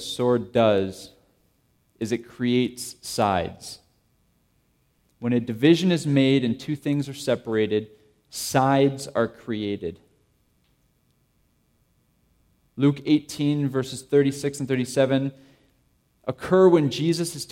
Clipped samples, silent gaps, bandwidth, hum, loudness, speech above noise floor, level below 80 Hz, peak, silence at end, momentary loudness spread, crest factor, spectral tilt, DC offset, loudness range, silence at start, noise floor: under 0.1%; none; 16.5 kHz; none; -23 LUFS; 44 dB; -60 dBFS; -6 dBFS; 0.05 s; 14 LU; 20 dB; -6 dB/octave; under 0.1%; 6 LU; 0 s; -66 dBFS